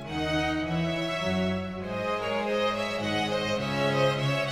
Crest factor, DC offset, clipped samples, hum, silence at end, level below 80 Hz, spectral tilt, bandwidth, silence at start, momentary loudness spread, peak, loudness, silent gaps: 14 dB; under 0.1%; under 0.1%; none; 0 s; -50 dBFS; -5.5 dB/octave; 15.5 kHz; 0 s; 5 LU; -14 dBFS; -28 LUFS; none